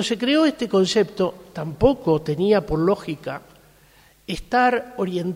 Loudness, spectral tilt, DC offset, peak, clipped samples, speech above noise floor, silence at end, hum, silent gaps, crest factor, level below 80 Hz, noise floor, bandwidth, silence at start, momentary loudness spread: -21 LUFS; -5.5 dB/octave; under 0.1%; -2 dBFS; under 0.1%; 33 dB; 0 s; none; none; 18 dB; -44 dBFS; -54 dBFS; 16 kHz; 0 s; 14 LU